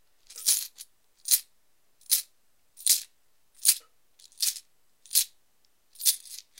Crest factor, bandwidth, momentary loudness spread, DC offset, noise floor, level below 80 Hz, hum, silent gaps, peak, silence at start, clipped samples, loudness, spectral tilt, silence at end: 28 dB; 17 kHz; 11 LU; under 0.1%; -71 dBFS; -80 dBFS; none; none; -4 dBFS; 0.3 s; under 0.1%; -26 LUFS; 5.5 dB/octave; 0.2 s